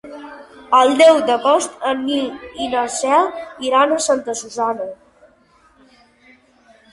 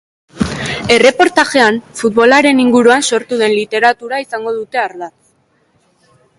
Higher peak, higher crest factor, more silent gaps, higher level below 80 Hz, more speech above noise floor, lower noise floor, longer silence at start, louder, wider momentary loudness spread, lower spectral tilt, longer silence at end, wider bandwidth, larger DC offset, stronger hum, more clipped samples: about the same, -2 dBFS vs 0 dBFS; about the same, 16 dB vs 12 dB; neither; second, -60 dBFS vs -44 dBFS; second, 37 dB vs 45 dB; about the same, -54 dBFS vs -56 dBFS; second, 0.05 s vs 0.35 s; second, -17 LUFS vs -12 LUFS; first, 16 LU vs 11 LU; second, -2 dB/octave vs -3.5 dB/octave; first, 2 s vs 1.3 s; about the same, 11.5 kHz vs 11.5 kHz; neither; neither; neither